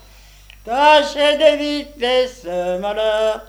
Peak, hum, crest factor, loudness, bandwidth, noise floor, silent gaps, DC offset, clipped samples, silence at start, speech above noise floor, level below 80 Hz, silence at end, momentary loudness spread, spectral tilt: 0 dBFS; 50 Hz at -50 dBFS; 18 dB; -16 LUFS; 16 kHz; -44 dBFS; none; under 0.1%; under 0.1%; 0.65 s; 28 dB; -46 dBFS; 0.05 s; 11 LU; -3 dB/octave